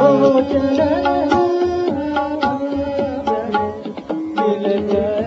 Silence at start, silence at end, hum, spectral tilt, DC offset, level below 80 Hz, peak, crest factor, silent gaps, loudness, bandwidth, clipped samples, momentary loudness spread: 0 s; 0 s; none; -5 dB/octave; under 0.1%; -48 dBFS; 0 dBFS; 16 dB; none; -18 LUFS; 7.6 kHz; under 0.1%; 7 LU